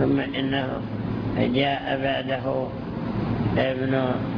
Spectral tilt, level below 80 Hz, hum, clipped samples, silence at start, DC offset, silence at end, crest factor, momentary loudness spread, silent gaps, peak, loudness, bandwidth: -9 dB/octave; -44 dBFS; none; under 0.1%; 0 s; under 0.1%; 0 s; 16 dB; 6 LU; none; -8 dBFS; -25 LUFS; 5.4 kHz